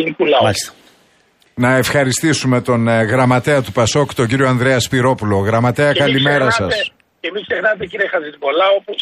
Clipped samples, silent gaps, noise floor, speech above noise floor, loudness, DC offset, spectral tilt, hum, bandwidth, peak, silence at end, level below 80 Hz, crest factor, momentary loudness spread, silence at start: under 0.1%; none; -55 dBFS; 40 dB; -15 LUFS; under 0.1%; -5 dB/octave; none; 15.5 kHz; -2 dBFS; 0 s; -48 dBFS; 14 dB; 7 LU; 0 s